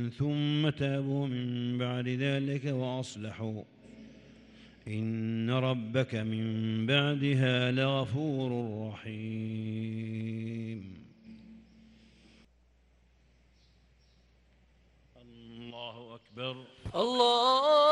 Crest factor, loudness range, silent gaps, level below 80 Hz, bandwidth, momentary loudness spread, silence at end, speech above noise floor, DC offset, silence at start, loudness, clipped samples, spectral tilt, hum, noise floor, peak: 20 dB; 16 LU; none; -66 dBFS; 10 kHz; 21 LU; 0 s; 35 dB; under 0.1%; 0 s; -31 LUFS; under 0.1%; -6.5 dB/octave; none; -65 dBFS; -12 dBFS